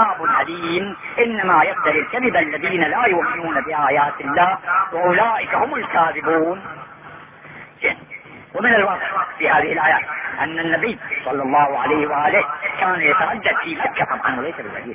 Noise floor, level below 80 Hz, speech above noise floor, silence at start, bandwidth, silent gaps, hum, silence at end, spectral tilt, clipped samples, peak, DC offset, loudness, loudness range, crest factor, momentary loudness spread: -40 dBFS; -56 dBFS; 21 dB; 0 s; 3.8 kHz; none; none; 0 s; -8 dB/octave; under 0.1%; -4 dBFS; under 0.1%; -18 LUFS; 3 LU; 16 dB; 10 LU